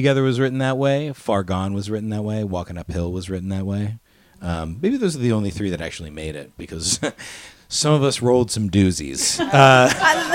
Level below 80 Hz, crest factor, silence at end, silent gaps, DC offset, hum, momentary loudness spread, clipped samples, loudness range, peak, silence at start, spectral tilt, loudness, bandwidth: -44 dBFS; 20 dB; 0 s; none; under 0.1%; none; 16 LU; under 0.1%; 8 LU; 0 dBFS; 0 s; -4.5 dB/octave; -20 LUFS; 17 kHz